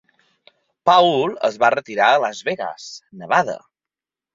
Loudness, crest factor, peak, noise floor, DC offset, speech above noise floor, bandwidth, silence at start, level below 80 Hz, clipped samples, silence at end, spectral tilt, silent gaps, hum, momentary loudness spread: -18 LUFS; 18 dB; -2 dBFS; -89 dBFS; under 0.1%; 71 dB; 7.6 kHz; 0.85 s; -68 dBFS; under 0.1%; 0.8 s; -4 dB/octave; none; none; 20 LU